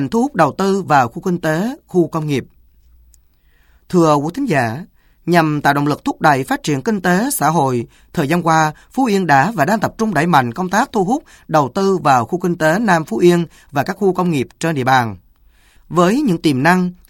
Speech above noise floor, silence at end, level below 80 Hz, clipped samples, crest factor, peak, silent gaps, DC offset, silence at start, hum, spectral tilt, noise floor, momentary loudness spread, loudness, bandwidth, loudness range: 38 dB; 0.15 s; -50 dBFS; under 0.1%; 16 dB; 0 dBFS; none; under 0.1%; 0 s; none; -6 dB/octave; -53 dBFS; 7 LU; -16 LUFS; 17.5 kHz; 4 LU